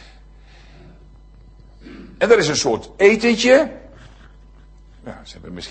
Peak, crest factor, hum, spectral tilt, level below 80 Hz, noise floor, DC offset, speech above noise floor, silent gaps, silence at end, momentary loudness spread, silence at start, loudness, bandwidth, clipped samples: 0 dBFS; 20 dB; none; -3.5 dB/octave; -46 dBFS; -45 dBFS; under 0.1%; 28 dB; none; 0 s; 25 LU; 1.85 s; -16 LUFS; 8.8 kHz; under 0.1%